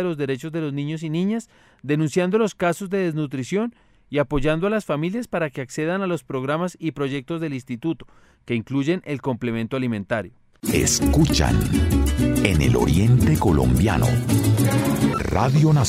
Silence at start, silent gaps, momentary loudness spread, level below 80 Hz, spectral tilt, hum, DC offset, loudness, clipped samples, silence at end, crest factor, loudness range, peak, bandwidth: 0 s; none; 10 LU; -32 dBFS; -6 dB/octave; none; under 0.1%; -22 LUFS; under 0.1%; 0 s; 18 dB; 8 LU; -2 dBFS; 16 kHz